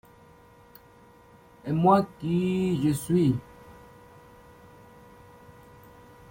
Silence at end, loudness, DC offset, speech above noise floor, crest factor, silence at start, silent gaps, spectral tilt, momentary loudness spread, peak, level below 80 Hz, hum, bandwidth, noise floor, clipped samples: 2.6 s; -25 LUFS; under 0.1%; 30 dB; 22 dB; 1.65 s; none; -7.5 dB/octave; 10 LU; -6 dBFS; -58 dBFS; none; 16.5 kHz; -54 dBFS; under 0.1%